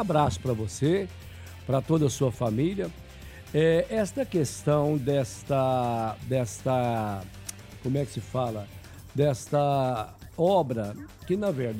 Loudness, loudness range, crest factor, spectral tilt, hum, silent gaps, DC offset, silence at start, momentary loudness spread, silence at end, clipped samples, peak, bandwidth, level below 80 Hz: -27 LUFS; 3 LU; 18 dB; -6.5 dB/octave; none; none; under 0.1%; 0 s; 15 LU; 0 s; under 0.1%; -10 dBFS; 16 kHz; -52 dBFS